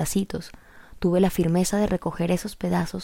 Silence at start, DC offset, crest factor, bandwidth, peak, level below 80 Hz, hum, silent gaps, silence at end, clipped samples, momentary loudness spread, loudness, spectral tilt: 0 s; under 0.1%; 16 dB; 16.5 kHz; -8 dBFS; -44 dBFS; none; none; 0 s; under 0.1%; 9 LU; -24 LUFS; -6 dB/octave